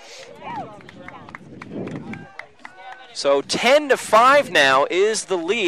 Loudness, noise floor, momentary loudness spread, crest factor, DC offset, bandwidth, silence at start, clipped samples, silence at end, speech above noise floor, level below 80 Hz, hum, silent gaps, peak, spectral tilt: -17 LUFS; -41 dBFS; 25 LU; 16 dB; 0.2%; 15.5 kHz; 0.05 s; under 0.1%; 0 s; 24 dB; -64 dBFS; none; none; -4 dBFS; -2.5 dB/octave